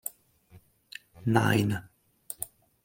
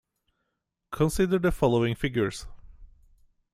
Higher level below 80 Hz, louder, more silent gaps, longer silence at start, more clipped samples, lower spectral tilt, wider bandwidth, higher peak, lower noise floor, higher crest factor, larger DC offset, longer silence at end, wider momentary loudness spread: second, -64 dBFS vs -44 dBFS; second, -29 LUFS vs -26 LUFS; neither; second, 0.05 s vs 0.9 s; neither; about the same, -5.5 dB/octave vs -6.5 dB/octave; first, 17 kHz vs 15 kHz; first, -6 dBFS vs -10 dBFS; second, -58 dBFS vs -81 dBFS; first, 24 dB vs 18 dB; neither; second, 0.4 s vs 0.65 s; first, 22 LU vs 10 LU